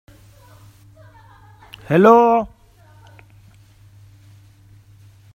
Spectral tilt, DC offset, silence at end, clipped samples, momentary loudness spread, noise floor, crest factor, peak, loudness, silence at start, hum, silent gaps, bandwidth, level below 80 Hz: -8 dB/octave; under 0.1%; 2.85 s; under 0.1%; 23 LU; -49 dBFS; 22 dB; 0 dBFS; -14 LUFS; 1.9 s; none; none; 15.5 kHz; -54 dBFS